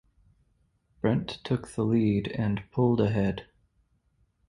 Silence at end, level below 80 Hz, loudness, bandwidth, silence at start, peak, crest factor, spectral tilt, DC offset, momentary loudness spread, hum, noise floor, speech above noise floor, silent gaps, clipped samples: 1.05 s; -52 dBFS; -28 LUFS; 11 kHz; 1.05 s; -10 dBFS; 18 dB; -8 dB/octave; under 0.1%; 7 LU; none; -70 dBFS; 43 dB; none; under 0.1%